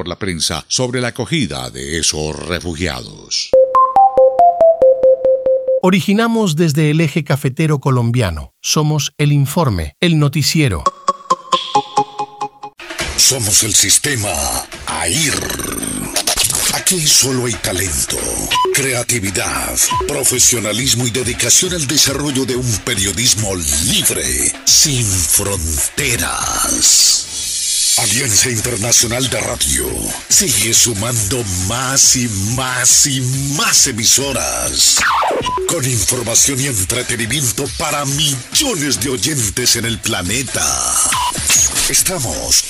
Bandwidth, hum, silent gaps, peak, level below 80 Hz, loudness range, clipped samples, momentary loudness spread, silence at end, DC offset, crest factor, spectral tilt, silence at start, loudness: 16.5 kHz; none; none; 0 dBFS; -36 dBFS; 4 LU; under 0.1%; 9 LU; 0 s; under 0.1%; 14 dB; -2.5 dB/octave; 0 s; -13 LUFS